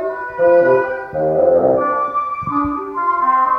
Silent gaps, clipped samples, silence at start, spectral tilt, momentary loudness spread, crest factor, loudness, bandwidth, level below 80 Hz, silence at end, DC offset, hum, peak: none; under 0.1%; 0 s; -9 dB/octave; 8 LU; 14 dB; -16 LUFS; 5.2 kHz; -46 dBFS; 0 s; under 0.1%; none; -2 dBFS